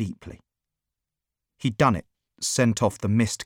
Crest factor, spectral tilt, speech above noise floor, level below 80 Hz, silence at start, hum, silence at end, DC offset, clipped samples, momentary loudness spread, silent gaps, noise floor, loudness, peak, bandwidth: 20 dB; -5 dB/octave; 63 dB; -52 dBFS; 0 s; none; 0 s; under 0.1%; under 0.1%; 12 LU; none; -87 dBFS; -24 LUFS; -6 dBFS; 16.5 kHz